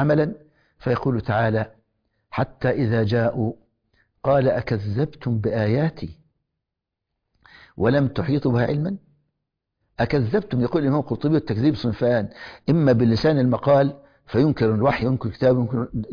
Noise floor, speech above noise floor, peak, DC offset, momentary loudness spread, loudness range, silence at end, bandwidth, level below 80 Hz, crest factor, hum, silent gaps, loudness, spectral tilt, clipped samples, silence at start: -83 dBFS; 63 dB; -8 dBFS; under 0.1%; 9 LU; 5 LU; 0 s; 5.2 kHz; -48 dBFS; 14 dB; none; none; -22 LUFS; -9.5 dB/octave; under 0.1%; 0 s